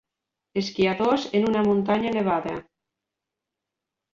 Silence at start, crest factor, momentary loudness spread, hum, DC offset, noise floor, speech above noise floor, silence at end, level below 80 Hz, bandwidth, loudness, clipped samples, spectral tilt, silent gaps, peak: 0.55 s; 18 dB; 10 LU; none; under 0.1%; -86 dBFS; 63 dB; 1.55 s; -60 dBFS; 7.4 kHz; -24 LUFS; under 0.1%; -6.5 dB/octave; none; -8 dBFS